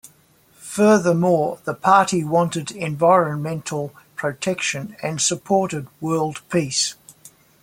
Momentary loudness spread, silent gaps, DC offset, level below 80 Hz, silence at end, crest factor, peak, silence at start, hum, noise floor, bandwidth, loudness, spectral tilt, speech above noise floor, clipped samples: 12 LU; none; under 0.1%; -62 dBFS; 0.35 s; 20 dB; -2 dBFS; 0.6 s; none; -55 dBFS; 16.5 kHz; -20 LUFS; -4.5 dB/octave; 36 dB; under 0.1%